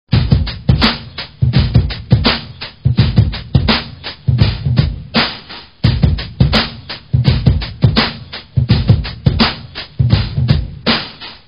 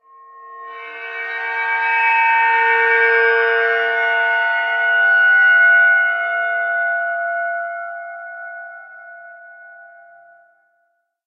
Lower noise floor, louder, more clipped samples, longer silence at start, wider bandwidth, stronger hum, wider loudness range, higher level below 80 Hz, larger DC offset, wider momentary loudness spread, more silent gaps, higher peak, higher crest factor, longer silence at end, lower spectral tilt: second, -33 dBFS vs -67 dBFS; about the same, -14 LUFS vs -15 LUFS; first, 0.3% vs under 0.1%; second, 0.1 s vs 0.35 s; about the same, 5.6 kHz vs 6 kHz; neither; second, 1 LU vs 14 LU; first, -22 dBFS vs under -90 dBFS; first, 0.4% vs under 0.1%; second, 9 LU vs 21 LU; neither; first, 0 dBFS vs -4 dBFS; about the same, 14 dB vs 14 dB; second, 0.1 s vs 1.4 s; first, -8 dB/octave vs 0.5 dB/octave